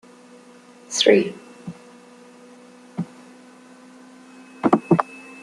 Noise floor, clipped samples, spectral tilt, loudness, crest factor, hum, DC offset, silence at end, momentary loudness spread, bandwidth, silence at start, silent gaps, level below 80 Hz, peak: -47 dBFS; under 0.1%; -4.5 dB/octave; -20 LUFS; 24 dB; none; under 0.1%; 0.1 s; 23 LU; 12 kHz; 0.9 s; none; -68 dBFS; -2 dBFS